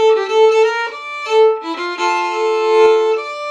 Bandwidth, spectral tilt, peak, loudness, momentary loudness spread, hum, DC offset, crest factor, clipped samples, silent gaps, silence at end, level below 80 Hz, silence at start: 9.2 kHz; -1 dB/octave; 0 dBFS; -15 LUFS; 9 LU; none; under 0.1%; 14 dB; under 0.1%; none; 0 s; -70 dBFS; 0 s